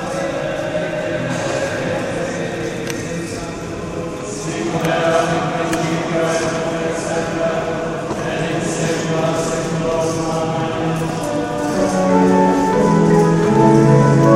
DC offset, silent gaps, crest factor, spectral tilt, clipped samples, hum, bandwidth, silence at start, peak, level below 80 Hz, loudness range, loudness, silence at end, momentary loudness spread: under 0.1%; none; 16 dB; -6 dB/octave; under 0.1%; none; 15.5 kHz; 0 s; 0 dBFS; -42 dBFS; 7 LU; -18 LUFS; 0 s; 11 LU